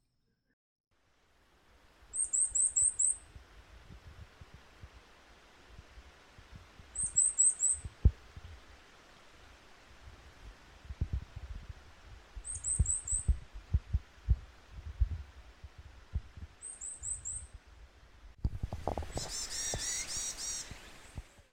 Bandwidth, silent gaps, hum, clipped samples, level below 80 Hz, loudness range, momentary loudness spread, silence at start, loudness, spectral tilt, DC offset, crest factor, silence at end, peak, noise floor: 16 kHz; none; none; under 0.1%; -44 dBFS; 13 LU; 28 LU; 2 s; -33 LUFS; -2.5 dB/octave; under 0.1%; 24 dB; 0.1 s; -14 dBFS; -78 dBFS